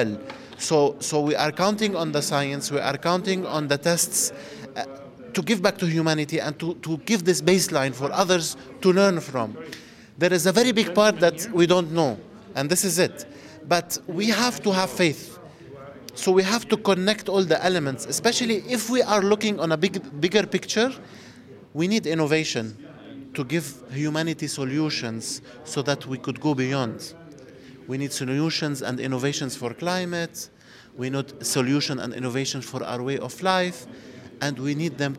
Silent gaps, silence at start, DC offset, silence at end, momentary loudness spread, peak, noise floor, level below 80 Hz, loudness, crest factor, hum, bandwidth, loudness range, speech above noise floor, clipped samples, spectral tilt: none; 0 s; under 0.1%; 0 s; 16 LU; -4 dBFS; -46 dBFS; -66 dBFS; -24 LUFS; 20 dB; none; 16.5 kHz; 6 LU; 22 dB; under 0.1%; -4 dB/octave